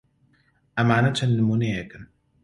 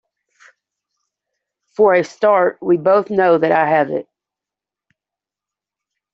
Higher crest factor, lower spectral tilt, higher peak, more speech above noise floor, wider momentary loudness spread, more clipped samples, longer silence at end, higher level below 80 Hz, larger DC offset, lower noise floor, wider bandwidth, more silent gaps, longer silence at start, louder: about the same, 20 dB vs 16 dB; about the same, -6.5 dB/octave vs -7 dB/octave; about the same, -4 dBFS vs -2 dBFS; second, 42 dB vs 73 dB; first, 12 LU vs 6 LU; neither; second, 0.4 s vs 2.1 s; first, -54 dBFS vs -64 dBFS; neither; second, -64 dBFS vs -87 dBFS; first, 11.5 kHz vs 7.8 kHz; neither; second, 0.75 s vs 1.8 s; second, -23 LUFS vs -15 LUFS